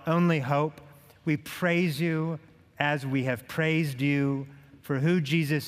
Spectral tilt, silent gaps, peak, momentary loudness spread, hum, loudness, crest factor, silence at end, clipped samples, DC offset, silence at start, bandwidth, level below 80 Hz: -7 dB/octave; none; -6 dBFS; 9 LU; none; -28 LUFS; 20 dB; 0 s; under 0.1%; under 0.1%; 0 s; 16 kHz; -68 dBFS